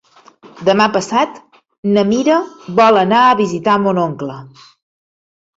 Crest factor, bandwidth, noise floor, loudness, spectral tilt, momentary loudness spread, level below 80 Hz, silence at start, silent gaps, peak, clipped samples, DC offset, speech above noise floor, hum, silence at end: 14 dB; 8 kHz; -44 dBFS; -14 LUFS; -5.5 dB/octave; 11 LU; -58 dBFS; 0.45 s; 1.78-1.83 s; 0 dBFS; under 0.1%; under 0.1%; 30 dB; none; 1.1 s